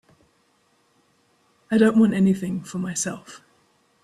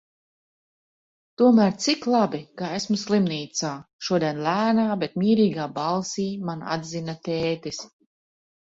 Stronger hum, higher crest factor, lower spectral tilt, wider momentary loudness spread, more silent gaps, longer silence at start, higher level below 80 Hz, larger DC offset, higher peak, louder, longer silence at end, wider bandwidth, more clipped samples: neither; about the same, 20 dB vs 18 dB; about the same, -6 dB/octave vs -5 dB/octave; about the same, 12 LU vs 12 LU; second, none vs 3.93-3.99 s; first, 1.7 s vs 1.4 s; about the same, -62 dBFS vs -64 dBFS; neither; about the same, -6 dBFS vs -6 dBFS; first, -21 LUFS vs -24 LUFS; second, 0.65 s vs 0.8 s; first, 13 kHz vs 7.8 kHz; neither